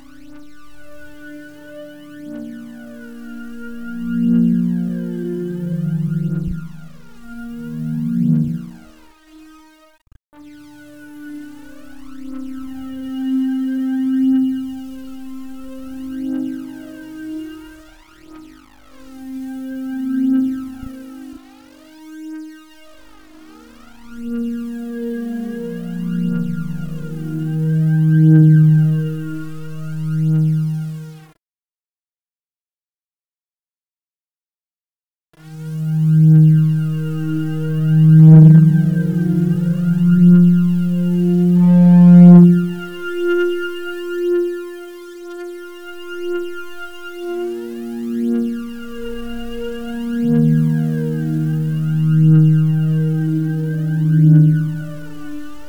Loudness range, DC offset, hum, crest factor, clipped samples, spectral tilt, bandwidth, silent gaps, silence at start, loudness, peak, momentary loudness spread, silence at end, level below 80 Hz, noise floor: 19 LU; 0.5%; none; 16 dB; under 0.1%; -9.5 dB/octave; 3.7 kHz; 10.25-10.29 s, 31.51-31.55 s, 32.21-32.25 s, 32.39-32.43 s; 0.3 s; -15 LUFS; 0 dBFS; 23 LU; 0 s; -48 dBFS; under -90 dBFS